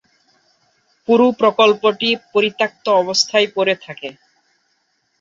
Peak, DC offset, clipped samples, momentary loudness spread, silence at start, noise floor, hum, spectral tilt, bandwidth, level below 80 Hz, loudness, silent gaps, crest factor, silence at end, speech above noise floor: 0 dBFS; under 0.1%; under 0.1%; 16 LU; 1.1 s; -66 dBFS; none; -3 dB/octave; 7.6 kHz; -68 dBFS; -16 LUFS; none; 18 dB; 1.1 s; 50 dB